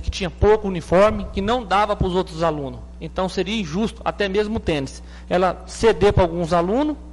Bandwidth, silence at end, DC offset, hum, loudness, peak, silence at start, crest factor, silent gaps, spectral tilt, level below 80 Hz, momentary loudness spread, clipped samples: 11.5 kHz; 0 s; under 0.1%; none; -20 LUFS; -6 dBFS; 0 s; 14 dB; none; -6 dB/octave; -34 dBFS; 9 LU; under 0.1%